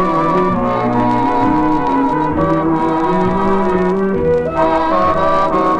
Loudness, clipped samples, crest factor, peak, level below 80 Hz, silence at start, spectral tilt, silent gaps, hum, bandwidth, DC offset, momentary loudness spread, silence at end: -14 LUFS; under 0.1%; 12 dB; -2 dBFS; -34 dBFS; 0 s; -8 dB/octave; none; none; 9.2 kHz; under 0.1%; 2 LU; 0 s